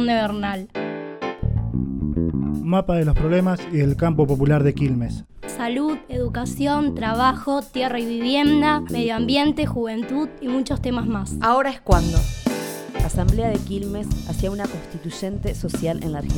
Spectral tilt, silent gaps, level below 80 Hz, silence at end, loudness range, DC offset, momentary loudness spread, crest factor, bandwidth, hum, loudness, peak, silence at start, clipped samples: -6.5 dB/octave; none; -30 dBFS; 0 s; 4 LU; under 0.1%; 10 LU; 20 dB; 19 kHz; none; -22 LUFS; -2 dBFS; 0 s; under 0.1%